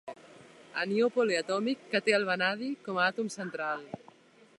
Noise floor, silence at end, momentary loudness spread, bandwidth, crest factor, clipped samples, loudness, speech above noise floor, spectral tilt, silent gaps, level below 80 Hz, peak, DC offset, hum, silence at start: -58 dBFS; 0.6 s; 14 LU; 11.5 kHz; 20 dB; under 0.1%; -30 LUFS; 28 dB; -4 dB/octave; none; -82 dBFS; -10 dBFS; under 0.1%; none; 0.05 s